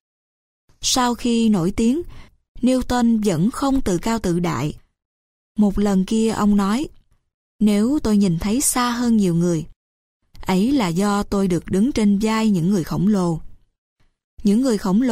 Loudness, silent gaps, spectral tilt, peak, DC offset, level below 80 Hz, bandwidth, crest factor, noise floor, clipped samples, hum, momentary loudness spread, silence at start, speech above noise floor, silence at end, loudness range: -19 LUFS; 2.48-2.55 s, 5.05-5.55 s, 7.34-7.59 s, 9.76-10.20 s, 13.78-13.96 s, 14.24-14.37 s; -5.5 dB/octave; -6 dBFS; under 0.1%; -38 dBFS; 16 kHz; 12 dB; under -90 dBFS; under 0.1%; none; 7 LU; 0.8 s; over 72 dB; 0 s; 2 LU